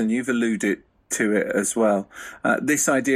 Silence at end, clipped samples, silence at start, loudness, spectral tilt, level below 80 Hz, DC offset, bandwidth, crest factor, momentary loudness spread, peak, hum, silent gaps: 0 s; under 0.1%; 0 s; -22 LUFS; -4 dB/octave; -64 dBFS; under 0.1%; 14.5 kHz; 14 dB; 8 LU; -8 dBFS; none; none